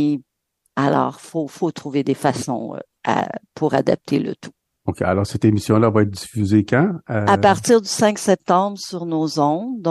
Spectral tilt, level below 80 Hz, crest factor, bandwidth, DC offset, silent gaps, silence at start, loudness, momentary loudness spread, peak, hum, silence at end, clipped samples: -6 dB/octave; -54 dBFS; 16 dB; 12.5 kHz; under 0.1%; none; 0 s; -19 LUFS; 12 LU; -2 dBFS; none; 0 s; under 0.1%